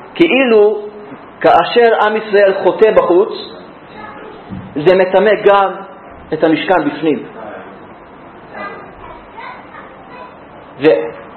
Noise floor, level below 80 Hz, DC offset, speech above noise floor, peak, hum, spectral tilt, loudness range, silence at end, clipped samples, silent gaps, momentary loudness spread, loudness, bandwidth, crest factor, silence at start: -36 dBFS; -50 dBFS; under 0.1%; 25 dB; 0 dBFS; none; -7.5 dB/octave; 14 LU; 0 s; 0.1%; none; 24 LU; -12 LUFS; 4.5 kHz; 14 dB; 0 s